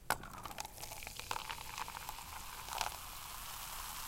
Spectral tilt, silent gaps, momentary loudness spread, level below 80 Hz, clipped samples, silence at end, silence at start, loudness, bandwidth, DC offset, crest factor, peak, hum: -1 dB/octave; none; 6 LU; -56 dBFS; under 0.1%; 0 s; 0 s; -44 LUFS; 17 kHz; under 0.1%; 32 dB; -12 dBFS; none